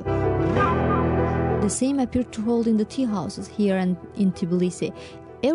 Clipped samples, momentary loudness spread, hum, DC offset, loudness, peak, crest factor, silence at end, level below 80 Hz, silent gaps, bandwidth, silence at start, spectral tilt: under 0.1%; 8 LU; none; under 0.1%; -23 LUFS; -10 dBFS; 14 dB; 0 s; -40 dBFS; none; 11 kHz; 0 s; -6.5 dB/octave